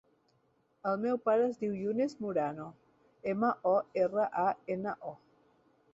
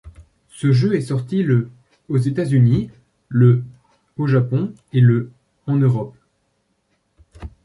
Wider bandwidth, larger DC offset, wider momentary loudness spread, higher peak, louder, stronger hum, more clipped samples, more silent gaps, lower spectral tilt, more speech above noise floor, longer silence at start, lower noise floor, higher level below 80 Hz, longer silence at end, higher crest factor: second, 8 kHz vs 11 kHz; neither; second, 11 LU vs 19 LU; second, -18 dBFS vs -4 dBFS; second, -33 LUFS vs -18 LUFS; neither; neither; neither; about the same, -8 dB/octave vs -9 dB/octave; second, 41 dB vs 51 dB; first, 0.85 s vs 0.05 s; first, -73 dBFS vs -67 dBFS; second, -76 dBFS vs -48 dBFS; first, 0.8 s vs 0.15 s; about the same, 16 dB vs 16 dB